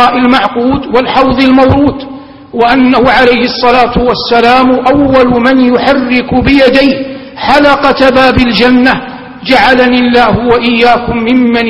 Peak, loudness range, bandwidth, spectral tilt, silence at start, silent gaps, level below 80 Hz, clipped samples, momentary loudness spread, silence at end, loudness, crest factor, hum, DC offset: 0 dBFS; 1 LU; 9 kHz; -6.5 dB/octave; 0 s; none; -28 dBFS; 2%; 6 LU; 0 s; -7 LUFS; 6 dB; none; 0.6%